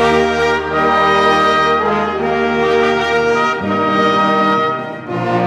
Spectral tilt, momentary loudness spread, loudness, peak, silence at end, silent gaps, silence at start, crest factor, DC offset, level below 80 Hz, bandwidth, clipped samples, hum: -5 dB/octave; 5 LU; -14 LUFS; -2 dBFS; 0 s; none; 0 s; 12 dB; under 0.1%; -42 dBFS; 11.5 kHz; under 0.1%; none